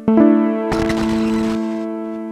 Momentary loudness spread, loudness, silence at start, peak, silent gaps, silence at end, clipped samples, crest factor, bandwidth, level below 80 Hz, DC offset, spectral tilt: 12 LU; -17 LUFS; 0 s; 0 dBFS; none; 0 s; under 0.1%; 16 dB; 11.5 kHz; -38 dBFS; under 0.1%; -7 dB/octave